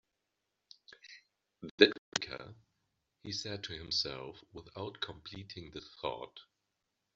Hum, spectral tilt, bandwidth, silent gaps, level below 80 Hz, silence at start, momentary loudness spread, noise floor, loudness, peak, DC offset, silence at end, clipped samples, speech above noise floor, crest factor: none; -1.5 dB/octave; 7.6 kHz; 1.71-1.78 s, 1.98-2.12 s; -68 dBFS; 0.9 s; 27 LU; -86 dBFS; -35 LUFS; -6 dBFS; under 0.1%; 0.75 s; under 0.1%; 49 dB; 34 dB